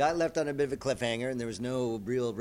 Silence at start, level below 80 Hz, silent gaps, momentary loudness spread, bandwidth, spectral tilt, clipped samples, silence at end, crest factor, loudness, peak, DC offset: 0 s; -58 dBFS; none; 4 LU; 16 kHz; -5 dB/octave; under 0.1%; 0 s; 16 dB; -32 LUFS; -14 dBFS; under 0.1%